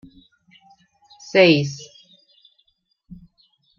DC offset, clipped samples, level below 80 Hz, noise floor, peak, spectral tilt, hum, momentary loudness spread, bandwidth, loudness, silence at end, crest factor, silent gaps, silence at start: under 0.1%; under 0.1%; -62 dBFS; -66 dBFS; -2 dBFS; -5.5 dB/octave; none; 29 LU; 7.4 kHz; -17 LUFS; 0.65 s; 22 dB; none; 1.35 s